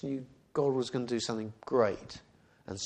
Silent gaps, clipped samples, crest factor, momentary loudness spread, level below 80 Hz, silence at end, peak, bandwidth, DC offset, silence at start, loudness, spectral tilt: none; under 0.1%; 20 dB; 15 LU; -66 dBFS; 0 s; -14 dBFS; 9.8 kHz; under 0.1%; 0.05 s; -33 LUFS; -5 dB/octave